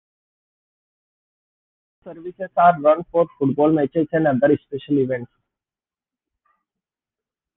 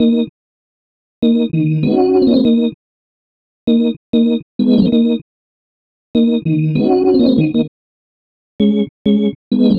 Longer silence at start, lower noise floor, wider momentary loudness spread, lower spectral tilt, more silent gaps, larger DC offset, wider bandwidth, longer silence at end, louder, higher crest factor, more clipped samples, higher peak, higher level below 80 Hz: first, 2.05 s vs 0 s; about the same, under -90 dBFS vs under -90 dBFS; first, 12 LU vs 7 LU; about the same, -11 dB/octave vs -10.5 dB/octave; second, none vs 0.29-1.22 s, 2.74-3.67 s, 3.97-4.13 s, 4.43-4.59 s, 5.22-6.14 s, 7.68-8.59 s, 8.89-9.05 s, 9.35-9.51 s; neither; second, 3.9 kHz vs 5 kHz; first, 2.3 s vs 0 s; second, -19 LUFS vs -14 LUFS; first, 20 dB vs 14 dB; neither; about the same, -2 dBFS vs 0 dBFS; second, -62 dBFS vs -48 dBFS